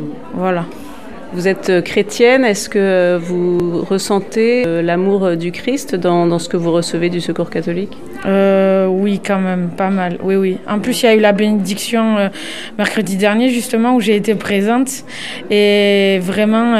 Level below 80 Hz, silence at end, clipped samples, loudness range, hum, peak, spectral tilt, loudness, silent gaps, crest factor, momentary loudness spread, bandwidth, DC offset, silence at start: -52 dBFS; 0 s; under 0.1%; 2 LU; none; 0 dBFS; -5.5 dB/octave; -15 LUFS; none; 14 dB; 9 LU; 15 kHz; 2%; 0 s